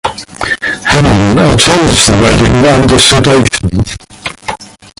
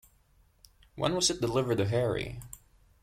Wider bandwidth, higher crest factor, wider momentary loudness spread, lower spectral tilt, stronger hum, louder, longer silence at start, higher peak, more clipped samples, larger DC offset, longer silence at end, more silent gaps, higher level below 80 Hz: about the same, 16 kHz vs 16 kHz; second, 8 dB vs 20 dB; second, 16 LU vs 19 LU; about the same, -4 dB/octave vs -4.5 dB/octave; neither; first, -7 LUFS vs -29 LUFS; second, 0.05 s vs 0.95 s; first, 0 dBFS vs -12 dBFS; first, 0.3% vs under 0.1%; neither; about the same, 0.35 s vs 0.45 s; neither; first, -24 dBFS vs -54 dBFS